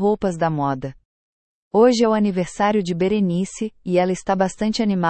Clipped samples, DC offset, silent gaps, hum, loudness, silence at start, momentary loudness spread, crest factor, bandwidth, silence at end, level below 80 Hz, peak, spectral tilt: under 0.1%; under 0.1%; 1.05-1.71 s; none; -20 LUFS; 0 s; 8 LU; 16 dB; 8.8 kHz; 0 s; -50 dBFS; -4 dBFS; -6 dB/octave